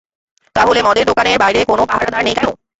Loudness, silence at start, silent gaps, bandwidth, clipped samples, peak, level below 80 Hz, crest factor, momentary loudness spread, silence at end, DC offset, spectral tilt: -13 LUFS; 0.55 s; none; 8.2 kHz; under 0.1%; 0 dBFS; -42 dBFS; 14 dB; 4 LU; 0.25 s; under 0.1%; -3.5 dB/octave